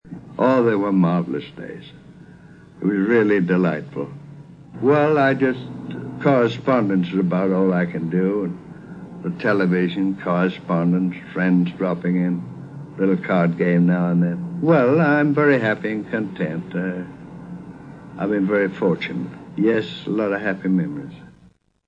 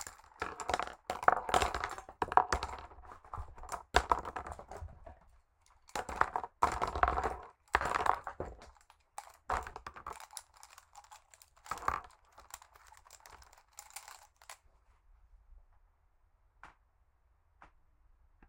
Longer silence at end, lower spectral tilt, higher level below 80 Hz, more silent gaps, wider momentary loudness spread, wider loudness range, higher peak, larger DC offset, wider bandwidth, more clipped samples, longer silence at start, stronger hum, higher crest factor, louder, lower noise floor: second, 0.6 s vs 0.85 s; first, -9 dB/octave vs -3.5 dB/octave; second, -58 dBFS vs -52 dBFS; neither; second, 18 LU vs 25 LU; second, 5 LU vs 20 LU; about the same, -4 dBFS vs -6 dBFS; neither; second, 6.8 kHz vs 17 kHz; neither; about the same, 0.05 s vs 0 s; neither; second, 16 dB vs 34 dB; first, -20 LUFS vs -36 LUFS; second, -54 dBFS vs -71 dBFS